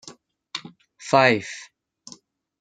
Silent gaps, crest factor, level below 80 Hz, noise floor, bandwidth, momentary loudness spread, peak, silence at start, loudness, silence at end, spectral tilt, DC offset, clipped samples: none; 24 dB; -72 dBFS; -51 dBFS; 9.4 kHz; 21 LU; -2 dBFS; 0.05 s; -19 LUFS; 1 s; -4.5 dB/octave; under 0.1%; under 0.1%